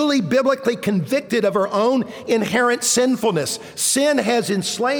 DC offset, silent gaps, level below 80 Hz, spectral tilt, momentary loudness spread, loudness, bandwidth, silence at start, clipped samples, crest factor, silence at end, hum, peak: under 0.1%; none; -62 dBFS; -3.5 dB/octave; 5 LU; -19 LUFS; over 20 kHz; 0 s; under 0.1%; 14 dB; 0 s; none; -6 dBFS